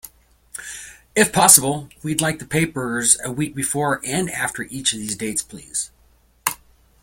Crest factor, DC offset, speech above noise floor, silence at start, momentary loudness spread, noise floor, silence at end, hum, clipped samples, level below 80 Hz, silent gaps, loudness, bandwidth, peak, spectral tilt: 22 dB; under 0.1%; 36 dB; 0.05 s; 20 LU; -56 dBFS; 0.5 s; none; under 0.1%; -52 dBFS; none; -19 LUFS; 17 kHz; 0 dBFS; -2.5 dB/octave